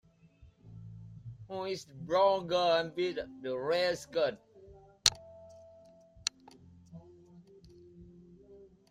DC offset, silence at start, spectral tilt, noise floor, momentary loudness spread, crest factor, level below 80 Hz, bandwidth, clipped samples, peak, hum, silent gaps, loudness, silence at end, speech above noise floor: under 0.1%; 0.4 s; -2.5 dB/octave; -61 dBFS; 26 LU; 30 dB; -66 dBFS; 15 kHz; under 0.1%; -4 dBFS; none; none; -32 LUFS; 0.25 s; 29 dB